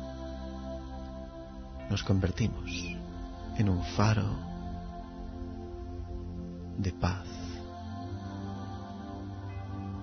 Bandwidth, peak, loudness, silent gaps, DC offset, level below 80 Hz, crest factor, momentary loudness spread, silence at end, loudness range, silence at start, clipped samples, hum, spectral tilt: 6.6 kHz; -12 dBFS; -36 LUFS; none; under 0.1%; -44 dBFS; 22 dB; 14 LU; 0 s; 6 LU; 0 s; under 0.1%; none; -6.5 dB/octave